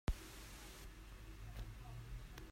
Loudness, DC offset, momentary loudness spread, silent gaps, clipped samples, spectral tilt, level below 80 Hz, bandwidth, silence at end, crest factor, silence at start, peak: -54 LUFS; under 0.1%; 6 LU; none; under 0.1%; -5 dB/octave; -50 dBFS; 16 kHz; 0 s; 22 dB; 0.05 s; -26 dBFS